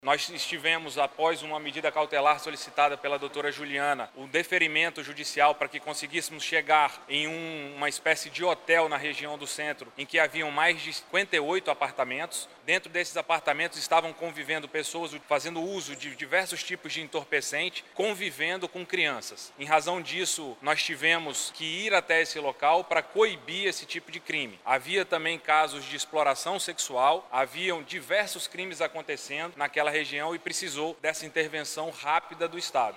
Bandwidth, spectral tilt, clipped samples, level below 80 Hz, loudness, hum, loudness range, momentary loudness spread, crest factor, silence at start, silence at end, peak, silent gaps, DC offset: 16 kHz; -2 dB/octave; under 0.1%; -80 dBFS; -28 LUFS; none; 4 LU; 9 LU; 22 dB; 0.05 s; 0 s; -8 dBFS; none; under 0.1%